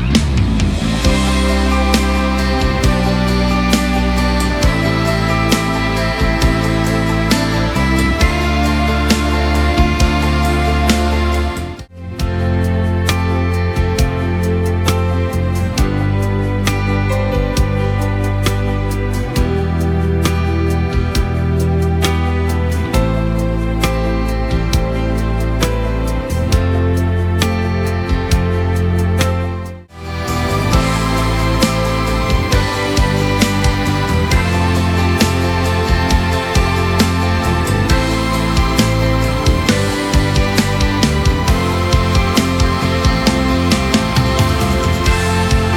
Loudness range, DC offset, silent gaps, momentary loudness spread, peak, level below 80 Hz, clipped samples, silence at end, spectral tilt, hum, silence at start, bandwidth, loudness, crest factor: 3 LU; under 0.1%; none; 4 LU; 0 dBFS; -20 dBFS; under 0.1%; 0 s; -5.5 dB/octave; none; 0 s; 18 kHz; -15 LUFS; 14 dB